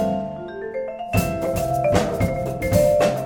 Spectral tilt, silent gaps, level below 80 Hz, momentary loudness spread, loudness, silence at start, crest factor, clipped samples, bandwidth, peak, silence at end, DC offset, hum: -6 dB/octave; none; -38 dBFS; 12 LU; -22 LUFS; 0 s; 18 dB; under 0.1%; 18 kHz; -4 dBFS; 0 s; under 0.1%; none